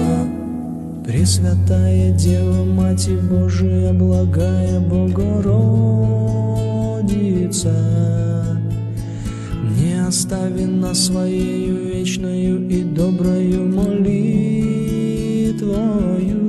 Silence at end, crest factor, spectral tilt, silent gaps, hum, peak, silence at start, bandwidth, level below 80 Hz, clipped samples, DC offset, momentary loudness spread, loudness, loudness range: 0 s; 12 dB; -6.5 dB/octave; none; none; -4 dBFS; 0 s; 12.5 kHz; -34 dBFS; under 0.1%; under 0.1%; 6 LU; -18 LUFS; 3 LU